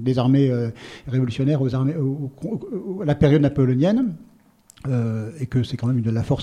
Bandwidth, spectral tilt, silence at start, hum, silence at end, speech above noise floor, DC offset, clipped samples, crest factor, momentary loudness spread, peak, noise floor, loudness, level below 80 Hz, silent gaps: 9.4 kHz; -8.5 dB/octave; 0 s; none; 0 s; 32 dB; under 0.1%; under 0.1%; 18 dB; 12 LU; -4 dBFS; -53 dBFS; -22 LUFS; -46 dBFS; none